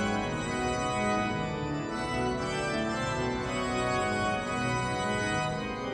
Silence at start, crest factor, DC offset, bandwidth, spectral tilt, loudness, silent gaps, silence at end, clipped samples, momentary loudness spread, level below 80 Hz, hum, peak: 0 s; 14 dB; under 0.1%; 12.5 kHz; -5 dB/octave; -30 LUFS; none; 0 s; under 0.1%; 4 LU; -48 dBFS; none; -18 dBFS